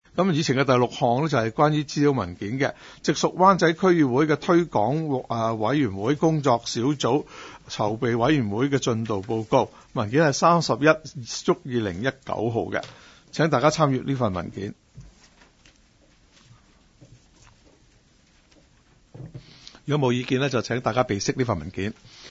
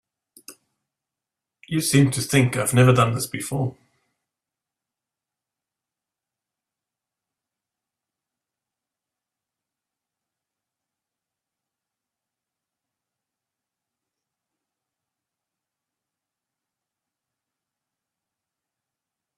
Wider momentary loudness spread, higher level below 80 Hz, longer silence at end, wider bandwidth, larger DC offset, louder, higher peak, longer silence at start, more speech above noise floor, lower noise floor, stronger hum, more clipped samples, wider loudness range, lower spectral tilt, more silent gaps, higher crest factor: about the same, 12 LU vs 11 LU; about the same, -56 dBFS vs -60 dBFS; second, 0 s vs 15.65 s; second, 8 kHz vs 14.5 kHz; neither; second, -23 LUFS vs -20 LUFS; about the same, -4 dBFS vs -2 dBFS; second, 0.15 s vs 0.5 s; second, 36 dB vs 69 dB; second, -59 dBFS vs -88 dBFS; neither; neither; second, 7 LU vs 13 LU; about the same, -5.5 dB/octave vs -5 dB/octave; neither; second, 20 dB vs 26 dB